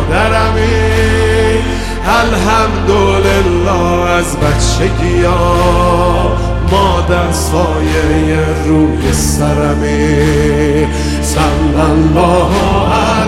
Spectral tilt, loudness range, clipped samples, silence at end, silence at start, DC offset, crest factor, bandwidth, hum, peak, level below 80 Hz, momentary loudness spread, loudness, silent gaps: -5.5 dB/octave; 1 LU; under 0.1%; 0 s; 0 s; under 0.1%; 10 dB; 15.5 kHz; none; 0 dBFS; -18 dBFS; 3 LU; -11 LUFS; none